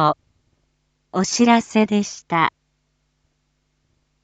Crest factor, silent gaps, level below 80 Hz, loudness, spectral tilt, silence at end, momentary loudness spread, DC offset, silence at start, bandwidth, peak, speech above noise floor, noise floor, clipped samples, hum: 20 dB; none; -64 dBFS; -19 LUFS; -4.5 dB/octave; 1.75 s; 9 LU; under 0.1%; 0 s; 8.8 kHz; -2 dBFS; 51 dB; -69 dBFS; under 0.1%; none